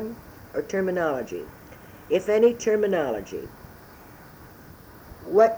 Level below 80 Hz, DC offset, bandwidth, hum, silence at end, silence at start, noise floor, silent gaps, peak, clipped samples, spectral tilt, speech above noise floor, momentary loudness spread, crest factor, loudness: -54 dBFS; under 0.1%; over 20 kHz; none; 0 s; 0 s; -47 dBFS; none; -6 dBFS; under 0.1%; -5.5 dB/octave; 24 dB; 26 LU; 20 dB; -25 LUFS